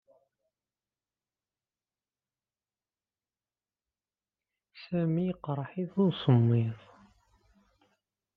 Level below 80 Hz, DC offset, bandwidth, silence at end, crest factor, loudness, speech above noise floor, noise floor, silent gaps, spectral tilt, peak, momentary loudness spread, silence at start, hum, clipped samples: -72 dBFS; under 0.1%; 5 kHz; 1.6 s; 24 dB; -29 LUFS; over 62 dB; under -90 dBFS; none; -10.5 dB/octave; -12 dBFS; 11 LU; 4.75 s; none; under 0.1%